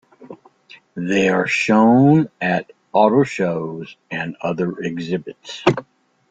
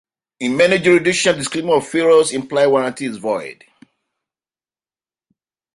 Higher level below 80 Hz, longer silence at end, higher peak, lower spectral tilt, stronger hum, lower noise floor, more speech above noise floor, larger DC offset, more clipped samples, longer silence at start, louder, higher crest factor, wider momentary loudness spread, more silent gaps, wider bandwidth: about the same, -58 dBFS vs -60 dBFS; second, 0.5 s vs 2.2 s; about the same, -2 dBFS vs -2 dBFS; first, -6.5 dB/octave vs -4 dB/octave; neither; second, -48 dBFS vs under -90 dBFS; second, 30 dB vs over 74 dB; neither; neither; second, 0.2 s vs 0.4 s; about the same, -18 LUFS vs -16 LUFS; about the same, 18 dB vs 16 dB; first, 16 LU vs 11 LU; neither; second, 9.2 kHz vs 11.5 kHz